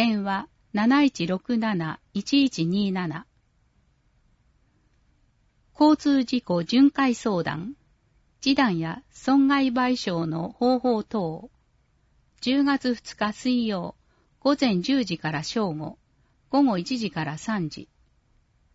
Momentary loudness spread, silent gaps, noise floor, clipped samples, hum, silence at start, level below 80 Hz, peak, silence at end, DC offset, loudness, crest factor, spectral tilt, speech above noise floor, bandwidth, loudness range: 12 LU; none; -65 dBFS; under 0.1%; none; 0 s; -60 dBFS; -8 dBFS; 0.9 s; under 0.1%; -24 LUFS; 18 dB; -5.5 dB/octave; 42 dB; 8 kHz; 5 LU